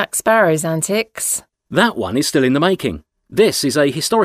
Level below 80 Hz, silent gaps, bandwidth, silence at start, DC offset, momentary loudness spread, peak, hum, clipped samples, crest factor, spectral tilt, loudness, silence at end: -50 dBFS; none; 16 kHz; 0 s; under 0.1%; 8 LU; 0 dBFS; none; under 0.1%; 16 dB; -4 dB/octave; -16 LUFS; 0 s